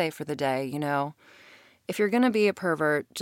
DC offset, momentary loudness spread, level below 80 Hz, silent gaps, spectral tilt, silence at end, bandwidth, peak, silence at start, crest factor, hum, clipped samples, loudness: under 0.1%; 10 LU; -76 dBFS; none; -5.5 dB/octave; 0 s; 17 kHz; -12 dBFS; 0 s; 16 dB; none; under 0.1%; -27 LUFS